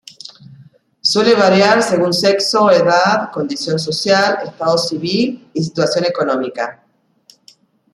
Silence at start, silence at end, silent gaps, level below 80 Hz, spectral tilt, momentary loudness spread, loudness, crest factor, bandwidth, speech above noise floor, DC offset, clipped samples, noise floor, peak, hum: 0.25 s; 1.2 s; none; -60 dBFS; -4 dB/octave; 11 LU; -14 LUFS; 14 dB; 13.5 kHz; 37 dB; under 0.1%; under 0.1%; -51 dBFS; 0 dBFS; none